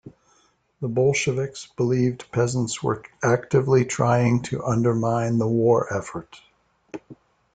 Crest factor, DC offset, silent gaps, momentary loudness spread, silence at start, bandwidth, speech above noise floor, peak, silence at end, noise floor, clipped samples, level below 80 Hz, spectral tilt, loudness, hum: 16 dB; under 0.1%; none; 13 LU; 0.05 s; 9.4 kHz; 41 dB; -6 dBFS; 0.4 s; -63 dBFS; under 0.1%; -56 dBFS; -6.5 dB/octave; -22 LUFS; none